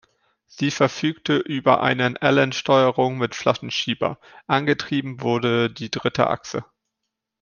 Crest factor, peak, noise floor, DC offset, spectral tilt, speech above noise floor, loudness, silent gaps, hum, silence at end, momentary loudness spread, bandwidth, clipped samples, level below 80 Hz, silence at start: 20 dB; -2 dBFS; -81 dBFS; under 0.1%; -5 dB/octave; 60 dB; -21 LUFS; none; none; 0.8 s; 8 LU; 7.2 kHz; under 0.1%; -62 dBFS; 0.55 s